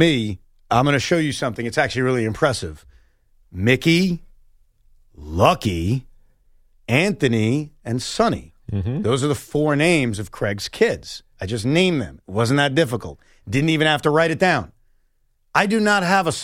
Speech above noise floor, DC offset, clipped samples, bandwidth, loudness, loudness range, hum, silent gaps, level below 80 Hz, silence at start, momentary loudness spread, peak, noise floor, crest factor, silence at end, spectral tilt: 43 dB; under 0.1%; under 0.1%; 16 kHz; -20 LUFS; 3 LU; none; none; -44 dBFS; 0 s; 12 LU; -2 dBFS; -63 dBFS; 18 dB; 0 s; -5.5 dB/octave